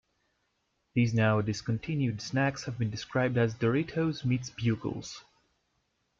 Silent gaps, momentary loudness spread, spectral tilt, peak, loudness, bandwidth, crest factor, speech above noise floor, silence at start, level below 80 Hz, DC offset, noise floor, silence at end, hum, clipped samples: none; 7 LU; -6.5 dB/octave; -14 dBFS; -30 LUFS; 7.6 kHz; 16 dB; 48 dB; 0.95 s; -60 dBFS; under 0.1%; -77 dBFS; 1 s; none; under 0.1%